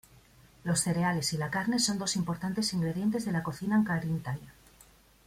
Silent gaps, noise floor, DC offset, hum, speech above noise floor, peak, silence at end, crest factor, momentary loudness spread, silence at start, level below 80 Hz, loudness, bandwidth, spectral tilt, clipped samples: none; -59 dBFS; under 0.1%; none; 29 dB; -14 dBFS; 0.75 s; 16 dB; 6 LU; 0.65 s; -60 dBFS; -30 LUFS; 16 kHz; -4.5 dB/octave; under 0.1%